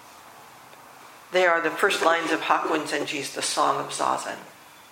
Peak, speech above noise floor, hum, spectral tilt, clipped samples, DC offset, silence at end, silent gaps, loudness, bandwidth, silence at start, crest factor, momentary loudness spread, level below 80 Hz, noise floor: -6 dBFS; 23 dB; none; -2 dB/octave; under 0.1%; under 0.1%; 0.2 s; none; -24 LUFS; 16.5 kHz; 0 s; 20 dB; 8 LU; -76 dBFS; -47 dBFS